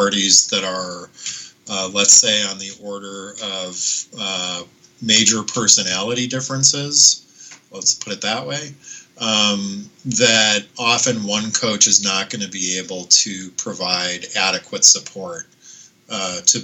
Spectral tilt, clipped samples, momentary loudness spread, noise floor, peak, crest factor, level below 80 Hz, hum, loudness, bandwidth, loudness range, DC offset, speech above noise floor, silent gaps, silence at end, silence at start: -1 dB/octave; under 0.1%; 18 LU; -45 dBFS; 0 dBFS; 18 dB; -68 dBFS; none; -15 LUFS; over 20 kHz; 3 LU; under 0.1%; 26 dB; none; 0 s; 0 s